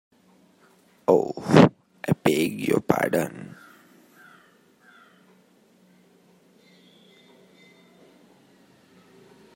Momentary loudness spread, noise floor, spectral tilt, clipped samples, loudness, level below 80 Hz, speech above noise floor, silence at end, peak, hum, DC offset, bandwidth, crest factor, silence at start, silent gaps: 17 LU; -59 dBFS; -6.5 dB/octave; under 0.1%; -22 LUFS; -66 dBFS; 36 dB; 6.1 s; 0 dBFS; none; under 0.1%; 16.5 kHz; 26 dB; 1.1 s; none